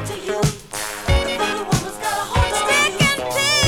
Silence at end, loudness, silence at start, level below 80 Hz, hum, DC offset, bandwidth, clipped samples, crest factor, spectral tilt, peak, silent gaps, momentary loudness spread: 0 s; -19 LUFS; 0 s; -30 dBFS; none; under 0.1%; over 20 kHz; under 0.1%; 12 dB; -3.5 dB/octave; -6 dBFS; none; 8 LU